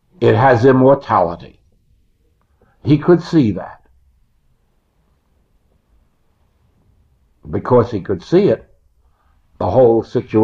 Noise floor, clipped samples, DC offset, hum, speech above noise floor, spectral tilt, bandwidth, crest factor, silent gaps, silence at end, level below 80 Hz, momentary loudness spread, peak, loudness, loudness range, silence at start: -60 dBFS; under 0.1%; under 0.1%; none; 47 dB; -9 dB/octave; 7.4 kHz; 16 dB; none; 0 s; -48 dBFS; 15 LU; -2 dBFS; -14 LUFS; 8 LU; 0.2 s